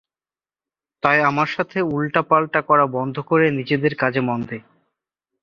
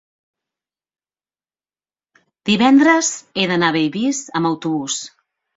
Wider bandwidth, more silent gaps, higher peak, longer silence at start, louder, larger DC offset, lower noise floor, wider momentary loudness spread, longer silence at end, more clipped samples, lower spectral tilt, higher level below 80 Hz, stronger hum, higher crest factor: second, 7 kHz vs 8 kHz; neither; about the same, 0 dBFS vs -2 dBFS; second, 1.05 s vs 2.45 s; about the same, -19 LUFS vs -17 LUFS; neither; about the same, under -90 dBFS vs under -90 dBFS; second, 8 LU vs 13 LU; first, 0.8 s vs 0.5 s; neither; first, -7.5 dB/octave vs -3.5 dB/octave; about the same, -60 dBFS vs -62 dBFS; neither; about the same, 20 dB vs 18 dB